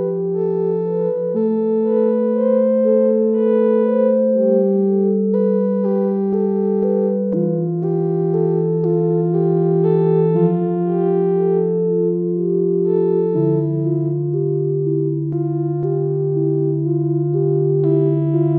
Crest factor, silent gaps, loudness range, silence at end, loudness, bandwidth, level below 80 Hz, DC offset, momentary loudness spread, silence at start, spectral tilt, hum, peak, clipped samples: 12 dB; none; 3 LU; 0 s; -17 LUFS; 3.7 kHz; -64 dBFS; under 0.1%; 4 LU; 0 s; -12.5 dB/octave; none; -4 dBFS; under 0.1%